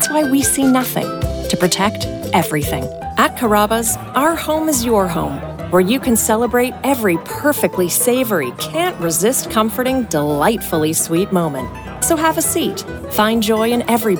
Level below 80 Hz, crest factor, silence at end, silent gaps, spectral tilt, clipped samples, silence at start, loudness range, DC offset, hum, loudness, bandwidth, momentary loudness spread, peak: -38 dBFS; 14 dB; 0 s; none; -4 dB/octave; under 0.1%; 0 s; 1 LU; under 0.1%; none; -16 LUFS; over 20 kHz; 7 LU; -2 dBFS